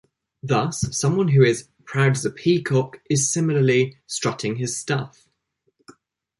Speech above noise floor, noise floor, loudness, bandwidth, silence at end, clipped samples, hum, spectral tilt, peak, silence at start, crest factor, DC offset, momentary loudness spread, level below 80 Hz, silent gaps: 50 dB; -71 dBFS; -21 LUFS; 11.5 kHz; 0.5 s; under 0.1%; none; -5 dB/octave; -4 dBFS; 0.45 s; 18 dB; under 0.1%; 9 LU; -54 dBFS; none